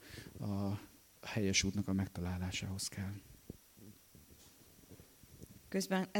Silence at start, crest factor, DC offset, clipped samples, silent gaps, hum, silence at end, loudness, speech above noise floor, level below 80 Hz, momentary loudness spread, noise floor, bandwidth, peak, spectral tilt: 0 s; 24 dB; under 0.1%; under 0.1%; none; none; 0 s; -39 LUFS; 24 dB; -62 dBFS; 26 LU; -62 dBFS; 17.5 kHz; -18 dBFS; -4 dB/octave